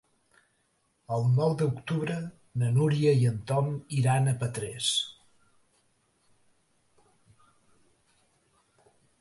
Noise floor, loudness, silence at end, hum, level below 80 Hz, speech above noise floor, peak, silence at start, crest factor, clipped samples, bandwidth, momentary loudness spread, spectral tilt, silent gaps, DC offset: -72 dBFS; -28 LUFS; 4.1 s; none; -64 dBFS; 46 dB; -12 dBFS; 1.1 s; 18 dB; under 0.1%; 11.5 kHz; 10 LU; -5.5 dB/octave; none; under 0.1%